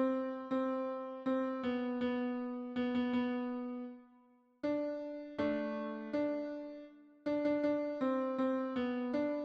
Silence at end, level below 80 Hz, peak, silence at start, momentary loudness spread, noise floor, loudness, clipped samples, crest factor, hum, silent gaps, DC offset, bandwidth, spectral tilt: 0 s; -74 dBFS; -22 dBFS; 0 s; 9 LU; -67 dBFS; -37 LUFS; under 0.1%; 14 dB; none; none; under 0.1%; 6.2 kHz; -7 dB/octave